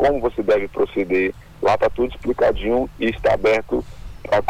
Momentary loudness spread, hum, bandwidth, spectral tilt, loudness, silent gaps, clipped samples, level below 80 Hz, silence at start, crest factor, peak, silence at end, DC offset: 7 LU; none; 18.5 kHz; -6.5 dB/octave; -20 LUFS; none; under 0.1%; -36 dBFS; 0 s; 10 dB; -10 dBFS; 0 s; under 0.1%